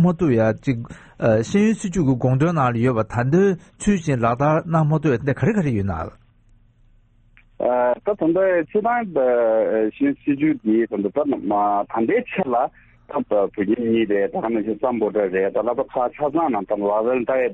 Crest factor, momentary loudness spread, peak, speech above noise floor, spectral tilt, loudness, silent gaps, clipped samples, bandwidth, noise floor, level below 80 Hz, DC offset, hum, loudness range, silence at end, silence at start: 14 dB; 5 LU; -6 dBFS; 35 dB; -8 dB/octave; -20 LUFS; none; under 0.1%; 8.4 kHz; -54 dBFS; -48 dBFS; under 0.1%; none; 3 LU; 0 s; 0 s